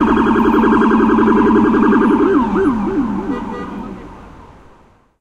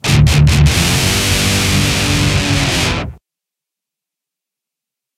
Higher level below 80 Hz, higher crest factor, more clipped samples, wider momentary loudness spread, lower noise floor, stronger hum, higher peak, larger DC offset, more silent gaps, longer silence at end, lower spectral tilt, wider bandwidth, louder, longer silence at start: second, -36 dBFS vs -22 dBFS; about the same, 14 dB vs 14 dB; neither; first, 15 LU vs 5 LU; second, -48 dBFS vs -84 dBFS; neither; about the same, 0 dBFS vs 0 dBFS; neither; neither; second, 0.8 s vs 2.05 s; first, -8 dB/octave vs -4 dB/octave; second, 7.8 kHz vs 16 kHz; about the same, -13 LUFS vs -12 LUFS; about the same, 0 s vs 0.05 s